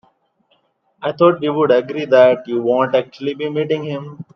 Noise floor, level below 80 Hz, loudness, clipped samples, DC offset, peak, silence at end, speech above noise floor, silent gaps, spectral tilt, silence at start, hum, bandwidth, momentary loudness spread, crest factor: -62 dBFS; -68 dBFS; -16 LUFS; under 0.1%; under 0.1%; 0 dBFS; 0.15 s; 46 dB; none; -7.5 dB/octave; 1 s; none; 6.2 kHz; 14 LU; 16 dB